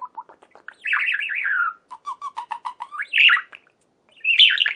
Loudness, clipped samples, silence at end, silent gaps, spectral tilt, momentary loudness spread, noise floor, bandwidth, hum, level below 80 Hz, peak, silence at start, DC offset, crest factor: -17 LUFS; under 0.1%; 0 s; none; 3 dB/octave; 20 LU; -62 dBFS; 10.5 kHz; none; -86 dBFS; -4 dBFS; 0 s; under 0.1%; 18 dB